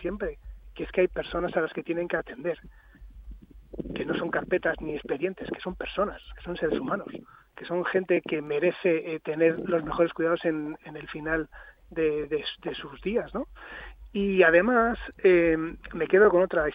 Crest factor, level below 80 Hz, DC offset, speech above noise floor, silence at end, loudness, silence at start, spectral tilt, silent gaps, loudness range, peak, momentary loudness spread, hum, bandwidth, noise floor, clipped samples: 22 dB; -50 dBFS; under 0.1%; 19 dB; 0 s; -27 LUFS; 0 s; -8.5 dB/octave; none; 7 LU; -6 dBFS; 18 LU; none; 5 kHz; -46 dBFS; under 0.1%